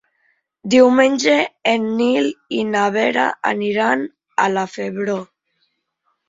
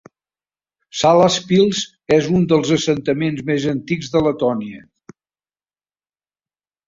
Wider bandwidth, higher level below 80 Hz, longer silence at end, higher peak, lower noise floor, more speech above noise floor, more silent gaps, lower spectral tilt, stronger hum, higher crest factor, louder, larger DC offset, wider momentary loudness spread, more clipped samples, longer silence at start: about the same, 7.8 kHz vs 7.8 kHz; second, -64 dBFS vs -52 dBFS; second, 1.05 s vs 2.1 s; about the same, -2 dBFS vs -2 dBFS; second, -70 dBFS vs under -90 dBFS; second, 53 dB vs over 73 dB; neither; about the same, -4.5 dB/octave vs -5.5 dB/octave; second, none vs 50 Hz at -45 dBFS; about the same, 16 dB vs 18 dB; about the same, -17 LUFS vs -17 LUFS; neither; about the same, 11 LU vs 9 LU; neither; second, 0.65 s vs 0.95 s